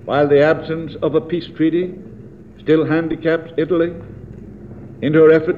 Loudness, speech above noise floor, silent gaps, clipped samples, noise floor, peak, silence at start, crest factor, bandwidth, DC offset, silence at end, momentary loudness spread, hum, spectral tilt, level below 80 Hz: -17 LUFS; 23 dB; none; under 0.1%; -38 dBFS; -2 dBFS; 0.05 s; 16 dB; 5 kHz; 0.3%; 0 s; 23 LU; none; -9 dB/octave; -48 dBFS